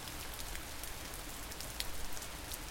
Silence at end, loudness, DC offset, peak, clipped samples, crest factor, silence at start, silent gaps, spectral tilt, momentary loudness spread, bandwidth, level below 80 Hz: 0 s; -43 LUFS; under 0.1%; -16 dBFS; under 0.1%; 26 dB; 0 s; none; -2 dB/octave; 3 LU; 17 kHz; -50 dBFS